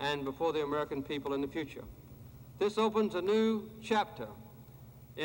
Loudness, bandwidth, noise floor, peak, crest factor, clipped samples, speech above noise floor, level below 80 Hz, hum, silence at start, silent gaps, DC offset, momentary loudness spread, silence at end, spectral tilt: -33 LUFS; 16.5 kHz; -53 dBFS; -16 dBFS; 18 dB; under 0.1%; 20 dB; -60 dBFS; none; 0 s; none; under 0.1%; 22 LU; 0 s; -5.5 dB/octave